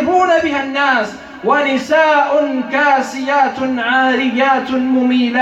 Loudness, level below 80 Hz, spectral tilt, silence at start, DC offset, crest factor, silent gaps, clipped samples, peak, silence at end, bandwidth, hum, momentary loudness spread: -14 LUFS; -54 dBFS; -4 dB/octave; 0 s; under 0.1%; 12 dB; none; under 0.1%; -2 dBFS; 0 s; 8.2 kHz; none; 5 LU